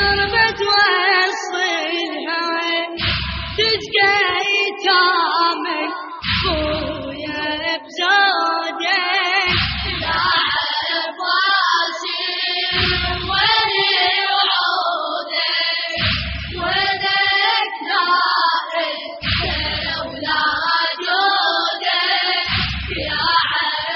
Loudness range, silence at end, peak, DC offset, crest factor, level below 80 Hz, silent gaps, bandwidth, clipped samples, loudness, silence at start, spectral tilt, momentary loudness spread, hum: 2 LU; 0 s; -2 dBFS; under 0.1%; 16 dB; -38 dBFS; none; 7 kHz; under 0.1%; -17 LUFS; 0 s; 0 dB/octave; 8 LU; none